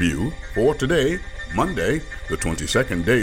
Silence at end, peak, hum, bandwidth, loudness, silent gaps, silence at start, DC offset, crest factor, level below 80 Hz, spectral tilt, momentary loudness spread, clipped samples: 0 s; -6 dBFS; none; 17 kHz; -22 LUFS; none; 0 s; under 0.1%; 16 dB; -34 dBFS; -5 dB/octave; 7 LU; under 0.1%